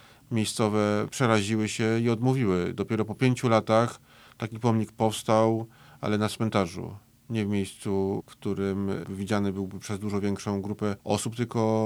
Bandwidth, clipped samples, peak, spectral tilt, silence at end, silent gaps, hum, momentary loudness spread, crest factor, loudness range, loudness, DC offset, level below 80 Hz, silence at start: over 20 kHz; under 0.1%; -6 dBFS; -6 dB/octave; 0 s; none; none; 10 LU; 20 dB; 5 LU; -27 LUFS; under 0.1%; -66 dBFS; 0.3 s